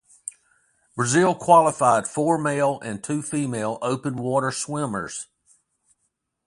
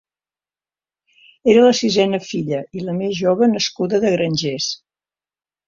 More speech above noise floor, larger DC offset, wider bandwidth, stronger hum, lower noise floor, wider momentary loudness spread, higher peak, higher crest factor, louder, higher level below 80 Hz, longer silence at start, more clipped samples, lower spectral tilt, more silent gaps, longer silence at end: second, 53 dB vs over 73 dB; neither; first, 11.5 kHz vs 7.6 kHz; second, none vs 50 Hz at -50 dBFS; second, -75 dBFS vs under -90 dBFS; first, 19 LU vs 12 LU; about the same, -4 dBFS vs -2 dBFS; about the same, 20 dB vs 18 dB; second, -22 LUFS vs -18 LUFS; second, -64 dBFS vs -58 dBFS; second, 0.25 s vs 1.45 s; neither; about the same, -5 dB/octave vs -5 dB/octave; neither; first, 1.2 s vs 0.9 s